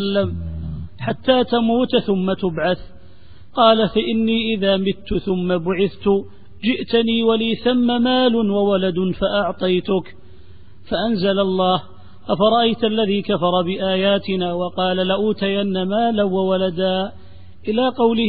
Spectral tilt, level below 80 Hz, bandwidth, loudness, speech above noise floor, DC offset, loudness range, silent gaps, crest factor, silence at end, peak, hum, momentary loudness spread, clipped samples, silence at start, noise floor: -11 dB/octave; -44 dBFS; 4.9 kHz; -19 LUFS; 28 dB; 1%; 2 LU; none; 18 dB; 0 s; -2 dBFS; none; 7 LU; under 0.1%; 0 s; -46 dBFS